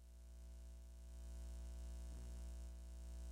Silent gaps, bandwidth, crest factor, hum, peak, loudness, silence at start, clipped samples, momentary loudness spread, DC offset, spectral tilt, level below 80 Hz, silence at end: none; 15.5 kHz; 8 dB; 60 Hz at -50 dBFS; -44 dBFS; -56 LUFS; 0 s; under 0.1%; 6 LU; under 0.1%; -5.5 dB/octave; -52 dBFS; 0 s